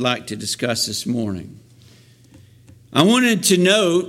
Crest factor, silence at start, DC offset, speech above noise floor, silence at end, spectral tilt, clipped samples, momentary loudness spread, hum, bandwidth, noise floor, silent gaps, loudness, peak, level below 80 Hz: 18 dB; 0 s; under 0.1%; 31 dB; 0 s; -3.5 dB/octave; under 0.1%; 11 LU; none; 16.5 kHz; -49 dBFS; none; -18 LUFS; -2 dBFS; -58 dBFS